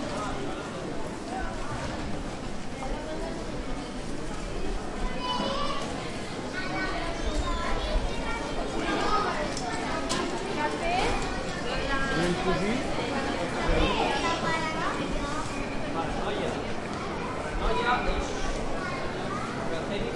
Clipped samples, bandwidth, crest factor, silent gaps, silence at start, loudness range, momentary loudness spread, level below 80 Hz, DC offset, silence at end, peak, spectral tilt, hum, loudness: under 0.1%; 11.5 kHz; 18 dB; none; 0 s; 7 LU; 8 LU; -36 dBFS; under 0.1%; 0 s; -12 dBFS; -4.5 dB/octave; none; -30 LUFS